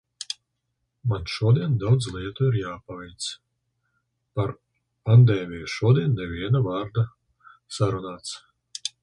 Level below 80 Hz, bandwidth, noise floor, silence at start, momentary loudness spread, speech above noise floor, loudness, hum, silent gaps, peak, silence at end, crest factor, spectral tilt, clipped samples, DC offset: -50 dBFS; 10.5 kHz; -78 dBFS; 0.2 s; 16 LU; 55 dB; -24 LUFS; none; none; -6 dBFS; 0.15 s; 18 dB; -6.5 dB/octave; under 0.1%; under 0.1%